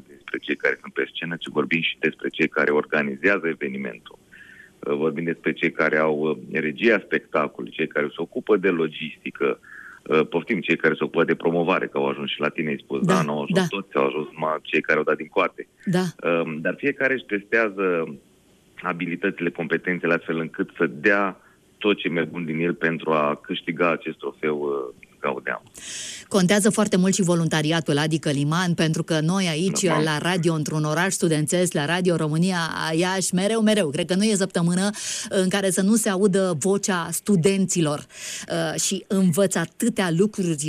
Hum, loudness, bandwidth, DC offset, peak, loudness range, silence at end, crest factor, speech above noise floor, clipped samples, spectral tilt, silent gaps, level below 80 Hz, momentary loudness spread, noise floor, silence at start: none; -23 LUFS; 14.5 kHz; under 0.1%; -6 dBFS; 4 LU; 0 s; 16 dB; 34 dB; under 0.1%; -4.5 dB/octave; none; -64 dBFS; 8 LU; -57 dBFS; 0.1 s